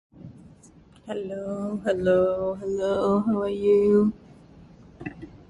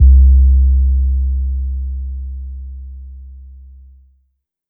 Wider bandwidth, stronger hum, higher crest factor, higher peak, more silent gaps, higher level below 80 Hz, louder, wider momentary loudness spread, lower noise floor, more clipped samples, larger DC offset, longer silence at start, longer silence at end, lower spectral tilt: first, 10.5 kHz vs 0.5 kHz; neither; about the same, 14 dB vs 12 dB; second, -10 dBFS vs -2 dBFS; neither; second, -54 dBFS vs -14 dBFS; second, -24 LUFS vs -15 LUFS; second, 19 LU vs 24 LU; second, -53 dBFS vs -65 dBFS; neither; neither; first, 0.15 s vs 0 s; second, 0.15 s vs 1.15 s; second, -8 dB/octave vs -17 dB/octave